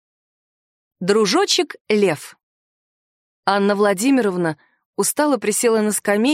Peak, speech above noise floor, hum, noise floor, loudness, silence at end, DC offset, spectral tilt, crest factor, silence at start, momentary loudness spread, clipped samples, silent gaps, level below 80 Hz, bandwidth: -4 dBFS; over 72 dB; none; under -90 dBFS; -18 LUFS; 0 s; under 0.1%; -3.5 dB/octave; 16 dB; 1 s; 9 LU; under 0.1%; 1.81-1.85 s, 2.43-3.43 s, 4.85-4.93 s; -72 dBFS; 16 kHz